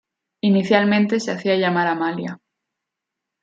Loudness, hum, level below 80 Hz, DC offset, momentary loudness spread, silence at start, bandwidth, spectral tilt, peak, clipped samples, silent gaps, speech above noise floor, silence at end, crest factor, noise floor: -19 LUFS; none; -70 dBFS; under 0.1%; 8 LU; 0.45 s; 7.8 kHz; -6 dB/octave; -2 dBFS; under 0.1%; none; 64 dB; 1.05 s; 18 dB; -83 dBFS